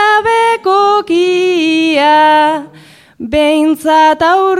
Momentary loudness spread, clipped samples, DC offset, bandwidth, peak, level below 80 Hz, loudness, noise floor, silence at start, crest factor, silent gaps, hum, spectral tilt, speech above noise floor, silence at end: 5 LU; under 0.1%; under 0.1%; 15 kHz; 0 dBFS; -44 dBFS; -10 LUFS; -40 dBFS; 0 s; 10 dB; none; none; -3.5 dB/octave; 30 dB; 0 s